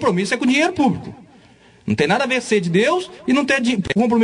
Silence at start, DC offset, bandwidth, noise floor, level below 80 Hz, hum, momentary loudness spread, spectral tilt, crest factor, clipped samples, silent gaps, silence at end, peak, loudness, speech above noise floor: 0 s; under 0.1%; 10.5 kHz; -49 dBFS; -52 dBFS; none; 7 LU; -5 dB/octave; 14 dB; under 0.1%; none; 0 s; -4 dBFS; -18 LUFS; 31 dB